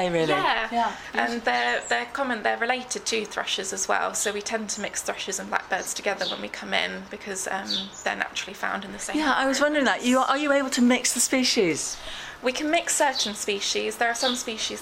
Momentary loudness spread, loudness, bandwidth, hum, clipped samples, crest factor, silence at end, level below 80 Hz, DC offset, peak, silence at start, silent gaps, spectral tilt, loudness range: 8 LU; -25 LUFS; 16.5 kHz; none; under 0.1%; 20 dB; 0 s; -58 dBFS; under 0.1%; -6 dBFS; 0 s; none; -2 dB/octave; 6 LU